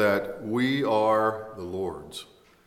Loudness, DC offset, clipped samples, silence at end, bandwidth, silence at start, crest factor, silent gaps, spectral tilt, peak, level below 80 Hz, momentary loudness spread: -26 LUFS; under 0.1%; under 0.1%; 0.4 s; 16 kHz; 0 s; 16 dB; none; -6 dB/octave; -10 dBFS; -62 dBFS; 16 LU